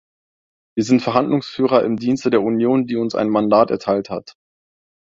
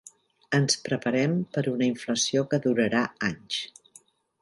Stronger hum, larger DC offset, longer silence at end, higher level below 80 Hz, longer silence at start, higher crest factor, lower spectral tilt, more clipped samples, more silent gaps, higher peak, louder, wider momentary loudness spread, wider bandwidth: neither; neither; about the same, 0.75 s vs 0.75 s; first, -58 dBFS vs -66 dBFS; first, 0.75 s vs 0.5 s; about the same, 18 dB vs 18 dB; first, -6.5 dB/octave vs -4.5 dB/octave; neither; neither; first, -2 dBFS vs -8 dBFS; first, -18 LUFS vs -26 LUFS; about the same, 7 LU vs 8 LU; second, 7.8 kHz vs 11.5 kHz